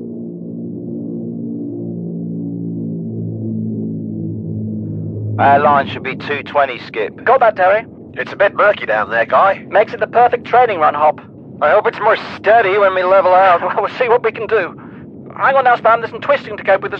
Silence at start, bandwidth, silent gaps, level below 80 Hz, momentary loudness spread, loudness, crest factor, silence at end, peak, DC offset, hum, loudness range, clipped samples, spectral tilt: 0 s; 6.4 kHz; none; -58 dBFS; 14 LU; -15 LUFS; 14 dB; 0 s; 0 dBFS; under 0.1%; none; 10 LU; under 0.1%; -8 dB/octave